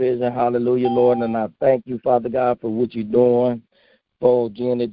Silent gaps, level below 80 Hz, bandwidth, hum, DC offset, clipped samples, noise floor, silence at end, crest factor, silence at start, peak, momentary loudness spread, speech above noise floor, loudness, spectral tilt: none; -58 dBFS; 5 kHz; none; under 0.1%; under 0.1%; -59 dBFS; 0 s; 16 dB; 0 s; -4 dBFS; 6 LU; 41 dB; -19 LUFS; -12.5 dB/octave